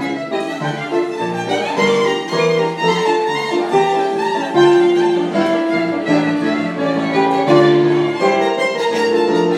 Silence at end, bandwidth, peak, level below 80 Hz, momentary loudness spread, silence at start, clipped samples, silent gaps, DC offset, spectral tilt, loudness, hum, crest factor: 0 s; 11.5 kHz; 0 dBFS; -66 dBFS; 8 LU; 0 s; under 0.1%; none; under 0.1%; -5.5 dB/octave; -16 LUFS; none; 14 dB